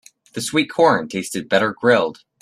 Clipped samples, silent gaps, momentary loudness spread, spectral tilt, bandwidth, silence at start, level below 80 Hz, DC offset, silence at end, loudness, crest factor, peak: under 0.1%; none; 11 LU; -4 dB/octave; 14 kHz; 0.35 s; -62 dBFS; under 0.1%; 0.3 s; -19 LUFS; 18 dB; -2 dBFS